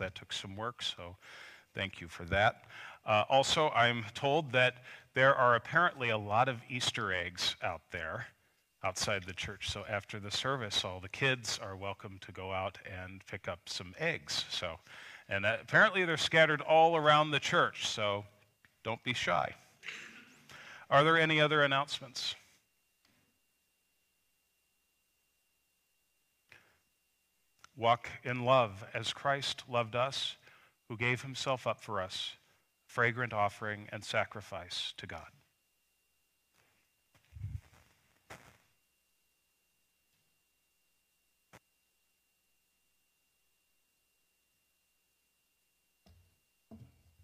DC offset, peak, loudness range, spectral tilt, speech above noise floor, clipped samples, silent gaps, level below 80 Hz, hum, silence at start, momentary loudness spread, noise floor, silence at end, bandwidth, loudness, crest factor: under 0.1%; -12 dBFS; 10 LU; -3.5 dB/octave; 45 dB; under 0.1%; none; -68 dBFS; none; 0 s; 20 LU; -78 dBFS; 0.4 s; 15.5 kHz; -32 LUFS; 22 dB